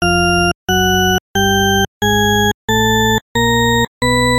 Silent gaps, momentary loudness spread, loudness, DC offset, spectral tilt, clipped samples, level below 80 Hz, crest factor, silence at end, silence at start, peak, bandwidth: 0.55-0.67 s, 1.20-1.34 s, 1.88-2.01 s, 2.54-2.68 s, 3.21-3.35 s, 3.88-4.01 s; 2 LU; -13 LUFS; under 0.1%; -3.5 dB/octave; under 0.1%; -30 dBFS; 10 dB; 0 s; 0 s; -4 dBFS; 16.5 kHz